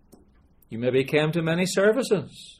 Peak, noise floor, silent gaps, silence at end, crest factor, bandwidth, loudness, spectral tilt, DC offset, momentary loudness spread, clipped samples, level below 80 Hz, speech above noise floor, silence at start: -6 dBFS; -57 dBFS; none; 0.05 s; 18 dB; 15.5 kHz; -23 LUFS; -5.5 dB/octave; under 0.1%; 7 LU; under 0.1%; -60 dBFS; 34 dB; 0.7 s